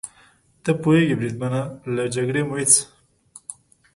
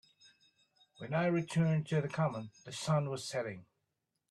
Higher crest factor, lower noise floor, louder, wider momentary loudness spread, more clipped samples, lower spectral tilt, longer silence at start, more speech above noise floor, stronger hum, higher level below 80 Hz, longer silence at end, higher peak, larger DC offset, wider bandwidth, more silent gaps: first, 22 dB vs 16 dB; second, -56 dBFS vs -85 dBFS; first, -20 LUFS vs -35 LUFS; first, 22 LU vs 13 LU; neither; second, -4.5 dB/octave vs -6.5 dB/octave; second, 0.05 s vs 1 s; second, 35 dB vs 51 dB; neither; first, -60 dBFS vs -74 dBFS; second, 0.45 s vs 0.7 s; first, 0 dBFS vs -20 dBFS; neither; about the same, 11.5 kHz vs 12 kHz; neither